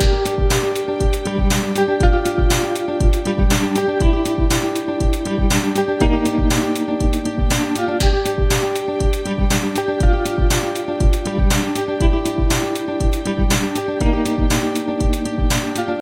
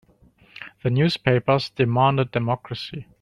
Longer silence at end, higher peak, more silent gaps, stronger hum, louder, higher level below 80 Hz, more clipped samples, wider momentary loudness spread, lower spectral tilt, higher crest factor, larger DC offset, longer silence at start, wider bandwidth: second, 0 s vs 0.2 s; about the same, -2 dBFS vs -4 dBFS; neither; neither; first, -19 LUFS vs -22 LUFS; first, -20 dBFS vs -56 dBFS; neither; second, 3 LU vs 14 LU; second, -5 dB/octave vs -7.5 dB/octave; about the same, 16 dB vs 20 dB; neither; second, 0 s vs 0.6 s; first, 16.5 kHz vs 10 kHz